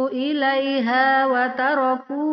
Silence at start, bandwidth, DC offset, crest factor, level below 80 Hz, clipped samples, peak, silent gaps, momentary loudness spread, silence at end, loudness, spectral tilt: 0 s; 6 kHz; under 0.1%; 14 dB; -76 dBFS; under 0.1%; -6 dBFS; none; 5 LU; 0 s; -20 LUFS; -0.5 dB/octave